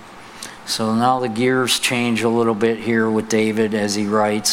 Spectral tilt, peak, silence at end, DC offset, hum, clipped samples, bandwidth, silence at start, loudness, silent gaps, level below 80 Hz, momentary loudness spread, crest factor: -4 dB/octave; -2 dBFS; 0 s; under 0.1%; none; under 0.1%; 16.5 kHz; 0 s; -18 LUFS; none; -58 dBFS; 8 LU; 16 dB